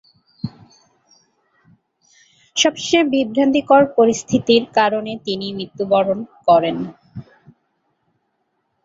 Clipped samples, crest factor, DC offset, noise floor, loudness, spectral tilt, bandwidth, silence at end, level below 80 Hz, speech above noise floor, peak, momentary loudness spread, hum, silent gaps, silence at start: under 0.1%; 18 dB; under 0.1%; -70 dBFS; -17 LUFS; -4 dB/octave; 8 kHz; 1.65 s; -58 dBFS; 53 dB; -2 dBFS; 18 LU; none; none; 0.45 s